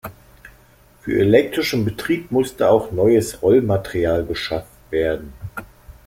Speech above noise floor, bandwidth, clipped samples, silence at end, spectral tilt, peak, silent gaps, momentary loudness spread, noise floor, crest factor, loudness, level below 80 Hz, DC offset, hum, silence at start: 33 dB; 16.5 kHz; under 0.1%; 0.15 s; -6 dB/octave; -2 dBFS; none; 18 LU; -51 dBFS; 18 dB; -19 LUFS; -44 dBFS; under 0.1%; none; 0.05 s